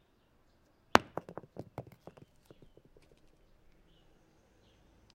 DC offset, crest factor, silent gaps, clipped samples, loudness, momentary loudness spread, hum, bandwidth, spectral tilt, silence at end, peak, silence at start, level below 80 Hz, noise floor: under 0.1%; 40 dB; none; under 0.1%; -33 LUFS; 27 LU; none; 16 kHz; -4 dB/octave; 3.35 s; 0 dBFS; 0.95 s; -66 dBFS; -69 dBFS